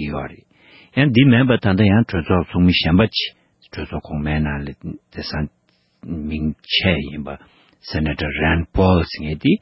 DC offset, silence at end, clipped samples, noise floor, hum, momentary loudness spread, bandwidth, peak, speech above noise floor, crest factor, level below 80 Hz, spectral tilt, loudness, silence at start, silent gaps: under 0.1%; 0.05 s; under 0.1%; -49 dBFS; none; 17 LU; 5.8 kHz; -2 dBFS; 31 dB; 18 dB; -32 dBFS; -10 dB/octave; -18 LUFS; 0 s; none